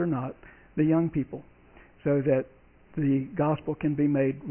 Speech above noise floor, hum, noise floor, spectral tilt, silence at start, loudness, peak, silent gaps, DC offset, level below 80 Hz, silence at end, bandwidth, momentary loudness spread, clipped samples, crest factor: 28 dB; none; -54 dBFS; -12.5 dB/octave; 0 s; -27 LUFS; -12 dBFS; none; under 0.1%; -56 dBFS; 0 s; 3.3 kHz; 13 LU; under 0.1%; 16 dB